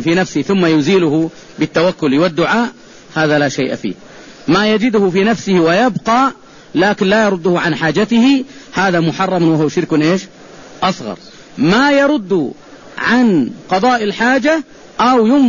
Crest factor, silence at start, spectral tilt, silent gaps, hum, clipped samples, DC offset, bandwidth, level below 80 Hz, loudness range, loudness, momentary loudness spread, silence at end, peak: 12 dB; 0 s; -5.5 dB/octave; none; none; under 0.1%; 0.3%; 7.4 kHz; -48 dBFS; 2 LU; -14 LUFS; 11 LU; 0 s; -2 dBFS